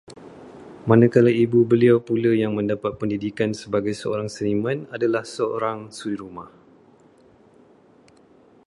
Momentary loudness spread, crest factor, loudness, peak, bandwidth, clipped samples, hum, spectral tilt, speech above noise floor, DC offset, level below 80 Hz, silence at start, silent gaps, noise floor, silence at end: 16 LU; 20 dB; -21 LUFS; -2 dBFS; 11.5 kHz; under 0.1%; none; -7.5 dB/octave; 33 dB; under 0.1%; -58 dBFS; 0.1 s; none; -54 dBFS; 2.2 s